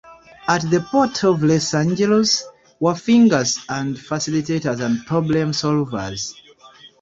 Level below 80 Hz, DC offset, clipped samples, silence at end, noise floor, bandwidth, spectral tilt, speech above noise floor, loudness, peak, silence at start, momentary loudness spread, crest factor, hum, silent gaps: -54 dBFS; under 0.1%; under 0.1%; 0.15 s; -46 dBFS; 7.8 kHz; -5 dB/octave; 28 dB; -19 LUFS; -2 dBFS; 0.05 s; 10 LU; 16 dB; none; none